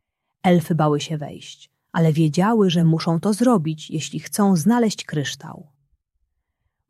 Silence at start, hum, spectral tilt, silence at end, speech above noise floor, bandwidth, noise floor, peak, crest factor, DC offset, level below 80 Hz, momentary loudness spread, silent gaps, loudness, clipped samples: 0.45 s; none; -6 dB/octave; 1.3 s; 55 dB; 14 kHz; -75 dBFS; -4 dBFS; 16 dB; under 0.1%; -62 dBFS; 12 LU; none; -20 LUFS; under 0.1%